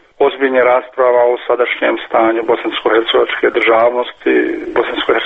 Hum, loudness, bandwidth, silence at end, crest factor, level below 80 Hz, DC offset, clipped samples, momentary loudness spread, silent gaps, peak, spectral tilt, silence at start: none; -13 LUFS; 4.6 kHz; 0 s; 12 dB; -52 dBFS; under 0.1%; under 0.1%; 5 LU; none; 0 dBFS; -5.5 dB/octave; 0.2 s